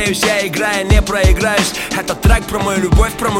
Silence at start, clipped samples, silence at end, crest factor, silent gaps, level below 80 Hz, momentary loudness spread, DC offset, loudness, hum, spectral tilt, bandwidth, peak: 0 s; under 0.1%; 0 s; 14 dB; none; -18 dBFS; 4 LU; under 0.1%; -14 LUFS; none; -4.5 dB/octave; 17 kHz; 0 dBFS